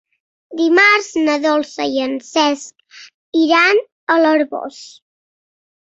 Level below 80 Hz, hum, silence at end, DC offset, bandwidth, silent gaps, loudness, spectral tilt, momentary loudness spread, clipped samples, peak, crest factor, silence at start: -66 dBFS; none; 0.95 s; under 0.1%; 8 kHz; 3.14-3.32 s, 3.92-4.07 s; -15 LUFS; -2 dB/octave; 15 LU; under 0.1%; -2 dBFS; 16 dB; 0.5 s